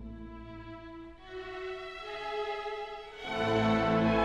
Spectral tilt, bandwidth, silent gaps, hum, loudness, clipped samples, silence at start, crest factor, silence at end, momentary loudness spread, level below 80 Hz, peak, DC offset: -6.5 dB/octave; 9.4 kHz; none; none; -33 LUFS; under 0.1%; 0 s; 16 dB; 0 s; 19 LU; -52 dBFS; -16 dBFS; under 0.1%